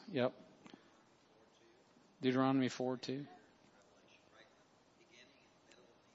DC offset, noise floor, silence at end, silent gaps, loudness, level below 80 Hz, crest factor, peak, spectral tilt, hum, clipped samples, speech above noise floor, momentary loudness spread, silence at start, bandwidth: under 0.1%; -69 dBFS; 0.95 s; none; -38 LUFS; -88 dBFS; 22 dB; -20 dBFS; -5 dB/octave; none; under 0.1%; 33 dB; 28 LU; 0 s; 7.6 kHz